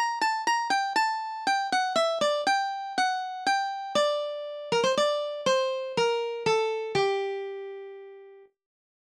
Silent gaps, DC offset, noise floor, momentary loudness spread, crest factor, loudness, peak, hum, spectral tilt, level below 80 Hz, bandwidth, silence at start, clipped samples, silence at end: none; under 0.1%; -51 dBFS; 10 LU; 16 dB; -27 LUFS; -12 dBFS; none; -2.5 dB/octave; -74 dBFS; 14 kHz; 0 s; under 0.1%; 0.75 s